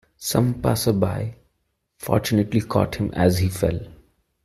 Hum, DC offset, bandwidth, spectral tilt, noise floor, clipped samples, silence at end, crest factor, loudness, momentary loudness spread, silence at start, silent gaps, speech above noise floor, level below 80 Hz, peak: none; under 0.1%; 15 kHz; -6 dB/octave; -73 dBFS; under 0.1%; 0.5 s; 20 dB; -22 LUFS; 8 LU; 0.2 s; none; 52 dB; -44 dBFS; -2 dBFS